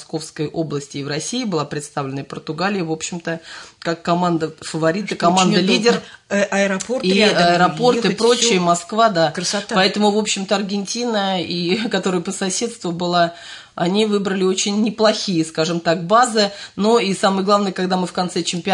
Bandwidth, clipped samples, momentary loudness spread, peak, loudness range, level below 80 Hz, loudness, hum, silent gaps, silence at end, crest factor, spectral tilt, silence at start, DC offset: 11 kHz; under 0.1%; 11 LU; -2 dBFS; 7 LU; -62 dBFS; -18 LUFS; none; none; 0 s; 16 dB; -4 dB/octave; 0 s; under 0.1%